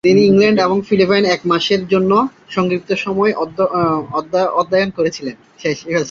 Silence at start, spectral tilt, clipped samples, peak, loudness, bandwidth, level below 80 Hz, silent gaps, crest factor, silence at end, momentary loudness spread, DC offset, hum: 0.05 s; -6 dB/octave; under 0.1%; -2 dBFS; -15 LUFS; 7.4 kHz; -52 dBFS; none; 14 dB; 0 s; 9 LU; under 0.1%; none